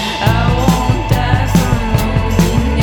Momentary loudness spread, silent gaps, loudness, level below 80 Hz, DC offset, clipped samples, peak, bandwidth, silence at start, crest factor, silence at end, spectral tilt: 2 LU; none; -14 LUFS; -20 dBFS; under 0.1%; under 0.1%; 0 dBFS; 19 kHz; 0 s; 12 dB; 0 s; -6 dB/octave